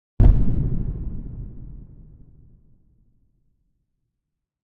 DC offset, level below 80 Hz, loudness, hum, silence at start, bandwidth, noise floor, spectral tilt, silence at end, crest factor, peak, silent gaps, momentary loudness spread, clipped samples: under 0.1%; -26 dBFS; -23 LUFS; none; 0.2 s; 2.3 kHz; -81 dBFS; -11.5 dB/octave; 2.8 s; 20 dB; -2 dBFS; none; 25 LU; under 0.1%